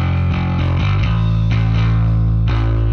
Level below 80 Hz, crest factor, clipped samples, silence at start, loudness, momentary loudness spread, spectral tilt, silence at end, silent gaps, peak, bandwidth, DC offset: -22 dBFS; 8 dB; under 0.1%; 0 s; -16 LUFS; 2 LU; -8.5 dB/octave; 0 s; none; -6 dBFS; 6.4 kHz; under 0.1%